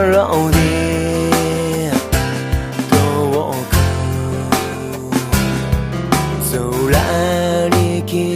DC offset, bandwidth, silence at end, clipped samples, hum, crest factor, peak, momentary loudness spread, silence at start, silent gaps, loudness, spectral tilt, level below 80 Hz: under 0.1%; 15.5 kHz; 0 s; under 0.1%; none; 16 dB; 0 dBFS; 6 LU; 0 s; none; -16 LUFS; -5.5 dB/octave; -28 dBFS